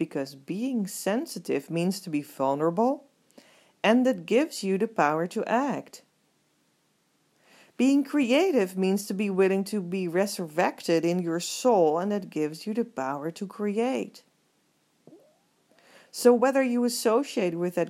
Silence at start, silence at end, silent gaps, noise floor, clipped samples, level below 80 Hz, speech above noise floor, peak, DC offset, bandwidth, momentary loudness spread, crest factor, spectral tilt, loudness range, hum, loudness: 0 s; 0 s; none; -70 dBFS; under 0.1%; -84 dBFS; 44 dB; -6 dBFS; under 0.1%; 16 kHz; 9 LU; 20 dB; -5 dB/octave; 5 LU; none; -26 LUFS